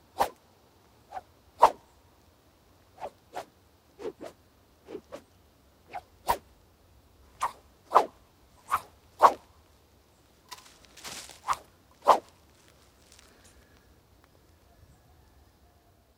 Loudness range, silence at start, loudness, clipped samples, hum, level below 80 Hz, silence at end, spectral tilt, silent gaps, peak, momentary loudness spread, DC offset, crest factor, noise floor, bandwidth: 17 LU; 0.2 s; -28 LUFS; under 0.1%; none; -62 dBFS; 3.95 s; -3 dB/octave; none; -4 dBFS; 24 LU; under 0.1%; 30 dB; -62 dBFS; 16 kHz